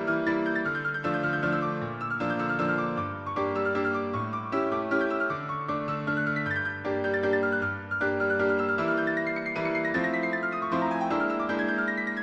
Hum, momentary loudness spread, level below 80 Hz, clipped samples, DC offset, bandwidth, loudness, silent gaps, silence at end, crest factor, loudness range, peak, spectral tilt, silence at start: none; 5 LU; -64 dBFS; under 0.1%; under 0.1%; 8.2 kHz; -28 LUFS; none; 0 s; 14 dB; 2 LU; -14 dBFS; -7.5 dB/octave; 0 s